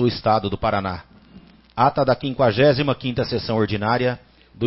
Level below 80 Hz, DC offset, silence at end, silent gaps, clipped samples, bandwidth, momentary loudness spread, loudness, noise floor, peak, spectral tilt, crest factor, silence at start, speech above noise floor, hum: -46 dBFS; under 0.1%; 0 s; none; under 0.1%; 5.8 kHz; 10 LU; -20 LUFS; -47 dBFS; -4 dBFS; -10 dB/octave; 18 dB; 0 s; 28 dB; none